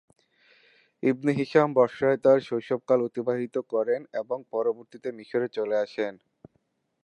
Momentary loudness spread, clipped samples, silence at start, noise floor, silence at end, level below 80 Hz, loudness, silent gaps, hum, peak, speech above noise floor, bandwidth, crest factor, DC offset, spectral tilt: 11 LU; under 0.1%; 1.05 s; -73 dBFS; 0.9 s; -74 dBFS; -26 LUFS; none; none; -6 dBFS; 47 dB; 9 kHz; 20 dB; under 0.1%; -7.5 dB/octave